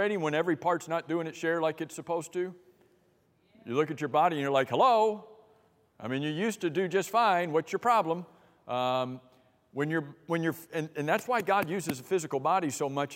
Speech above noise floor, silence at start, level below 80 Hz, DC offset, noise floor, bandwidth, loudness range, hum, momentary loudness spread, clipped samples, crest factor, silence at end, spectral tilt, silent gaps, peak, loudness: 39 dB; 0 s; -80 dBFS; under 0.1%; -68 dBFS; 16 kHz; 4 LU; none; 10 LU; under 0.1%; 18 dB; 0 s; -5 dB/octave; none; -12 dBFS; -30 LUFS